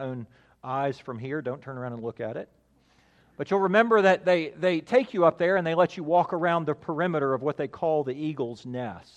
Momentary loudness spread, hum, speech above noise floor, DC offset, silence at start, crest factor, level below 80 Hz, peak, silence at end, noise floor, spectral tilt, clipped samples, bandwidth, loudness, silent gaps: 14 LU; none; 37 dB; under 0.1%; 0 s; 20 dB; -70 dBFS; -6 dBFS; 0.15 s; -63 dBFS; -7 dB/octave; under 0.1%; 9 kHz; -26 LUFS; none